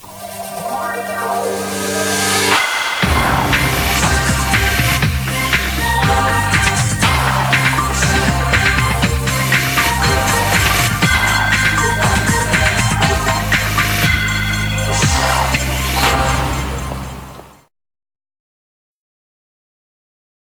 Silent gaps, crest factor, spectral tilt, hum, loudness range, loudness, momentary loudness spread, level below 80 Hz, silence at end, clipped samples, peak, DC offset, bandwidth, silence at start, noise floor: none; 16 dB; -3.5 dB/octave; none; 5 LU; -14 LUFS; 7 LU; -26 dBFS; 2.95 s; under 0.1%; 0 dBFS; under 0.1%; over 20 kHz; 0 s; -36 dBFS